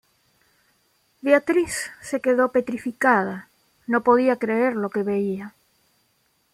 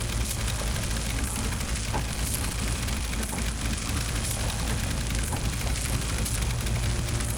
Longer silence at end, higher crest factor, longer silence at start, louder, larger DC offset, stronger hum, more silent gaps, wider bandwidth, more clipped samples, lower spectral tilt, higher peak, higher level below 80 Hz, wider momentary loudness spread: first, 1.05 s vs 0 s; about the same, 20 dB vs 18 dB; first, 1.25 s vs 0 s; first, -22 LUFS vs -29 LUFS; neither; neither; neither; second, 15.5 kHz vs over 20 kHz; neither; first, -5 dB/octave vs -3.5 dB/octave; first, -4 dBFS vs -10 dBFS; second, -64 dBFS vs -32 dBFS; first, 12 LU vs 1 LU